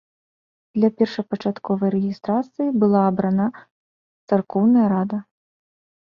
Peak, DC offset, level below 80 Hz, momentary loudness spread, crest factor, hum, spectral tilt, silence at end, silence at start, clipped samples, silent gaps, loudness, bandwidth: -4 dBFS; under 0.1%; -64 dBFS; 9 LU; 18 dB; none; -9.5 dB/octave; 0.8 s; 0.75 s; under 0.1%; 3.71-4.28 s; -21 LUFS; 6 kHz